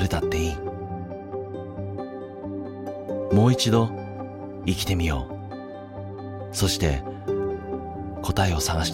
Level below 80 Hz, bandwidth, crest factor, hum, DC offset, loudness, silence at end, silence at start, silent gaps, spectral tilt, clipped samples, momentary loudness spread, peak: -40 dBFS; 16.5 kHz; 18 dB; none; under 0.1%; -27 LUFS; 0 s; 0 s; none; -5 dB/octave; under 0.1%; 15 LU; -8 dBFS